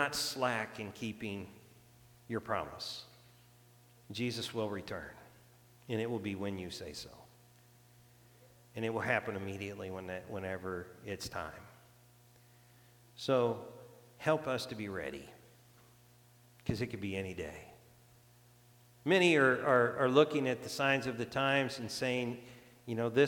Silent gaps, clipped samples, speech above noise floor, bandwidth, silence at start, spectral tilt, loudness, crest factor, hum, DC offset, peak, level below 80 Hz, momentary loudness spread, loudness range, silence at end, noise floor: none; under 0.1%; 28 dB; 19 kHz; 0 s; -5 dB/octave; -35 LUFS; 24 dB; 60 Hz at -65 dBFS; under 0.1%; -12 dBFS; -68 dBFS; 18 LU; 13 LU; 0 s; -63 dBFS